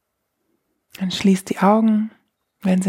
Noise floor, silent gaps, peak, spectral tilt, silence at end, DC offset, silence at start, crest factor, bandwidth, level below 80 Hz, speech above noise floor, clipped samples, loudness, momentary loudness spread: -73 dBFS; none; -4 dBFS; -6.5 dB/octave; 0 s; under 0.1%; 1 s; 18 dB; 14.5 kHz; -62 dBFS; 56 dB; under 0.1%; -19 LUFS; 12 LU